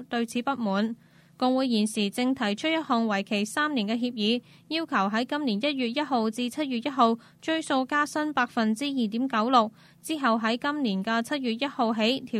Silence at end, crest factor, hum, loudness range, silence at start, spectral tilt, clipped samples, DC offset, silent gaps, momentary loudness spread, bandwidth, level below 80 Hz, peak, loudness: 0 s; 20 dB; none; 1 LU; 0 s; -4.5 dB/octave; under 0.1%; under 0.1%; none; 6 LU; 14.5 kHz; -74 dBFS; -8 dBFS; -27 LUFS